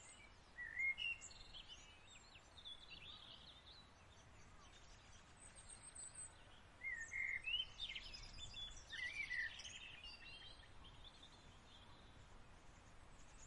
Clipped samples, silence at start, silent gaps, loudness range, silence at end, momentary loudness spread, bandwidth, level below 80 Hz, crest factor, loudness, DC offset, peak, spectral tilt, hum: under 0.1%; 0 s; none; 13 LU; 0 s; 21 LU; 11 kHz; -66 dBFS; 20 dB; -49 LUFS; under 0.1%; -34 dBFS; -0.5 dB/octave; none